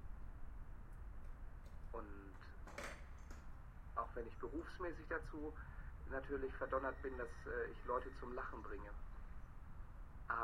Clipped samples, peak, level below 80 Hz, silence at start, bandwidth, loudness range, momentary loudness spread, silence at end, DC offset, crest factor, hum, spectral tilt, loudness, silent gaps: under 0.1%; -26 dBFS; -54 dBFS; 0 s; 13 kHz; 9 LU; 14 LU; 0 s; under 0.1%; 22 dB; none; -6.5 dB/octave; -50 LUFS; none